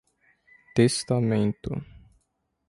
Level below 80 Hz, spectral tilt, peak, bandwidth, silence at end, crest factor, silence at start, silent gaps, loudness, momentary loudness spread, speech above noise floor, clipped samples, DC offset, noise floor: -54 dBFS; -6 dB/octave; -8 dBFS; 11.5 kHz; 0.7 s; 20 dB; 0.75 s; none; -25 LUFS; 12 LU; 52 dB; under 0.1%; under 0.1%; -76 dBFS